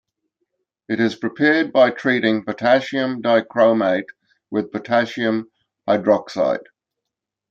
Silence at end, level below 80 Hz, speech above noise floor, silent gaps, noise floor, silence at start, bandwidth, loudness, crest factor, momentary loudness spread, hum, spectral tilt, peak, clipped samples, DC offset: 0.9 s; -68 dBFS; 65 dB; none; -83 dBFS; 0.9 s; 7.6 kHz; -19 LUFS; 18 dB; 10 LU; none; -6 dB/octave; -2 dBFS; under 0.1%; under 0.1%